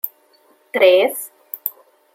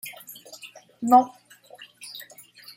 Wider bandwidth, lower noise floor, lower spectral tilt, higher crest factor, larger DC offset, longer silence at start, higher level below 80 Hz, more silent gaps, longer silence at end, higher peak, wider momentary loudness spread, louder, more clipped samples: about the same, 17 kHz vs 16.5 kHz; first, -56 dBFS vs -49 dBFS; second, -1.5 dB/octave vs -3.5 dB/octave; about the same, 18 dB vs 22 dB; neither; about the same, 0.05 s vs 0.05 s; about the same, -78 dBFS vs -76 dBFS; neither; about the same, 0.45 s vs 0.55 s; first, 0 dBFS vs -4 dBFS; second, 16 LU vs 26 LU; first, -17 LUFS vs -21 LUFS; neither